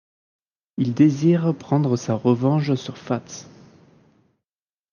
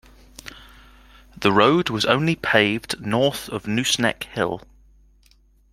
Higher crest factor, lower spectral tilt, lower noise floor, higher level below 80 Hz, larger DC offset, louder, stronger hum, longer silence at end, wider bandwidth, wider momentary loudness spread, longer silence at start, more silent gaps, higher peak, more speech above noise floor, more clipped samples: about the same, 18 dB vs 22 dB; first, -7.5 dB/octave vs -4 dB/octave; first, under -90 dBFS vs -56 dBFS; second, -68 dBFS vs -52 dBFS; neither; about the same, -21 LUFS vs -20 LUFS; neither; first, 1.5 s vs 1.15 s; second, 7.2 kHz vs 16.5 kHz; second, 12 LU vs 19 LU; first, 0.8 s vs 0.45 s; neither; about the same, -4 dBFS vs -2 dBFS; first, over 70 dB vs 36 dB; neither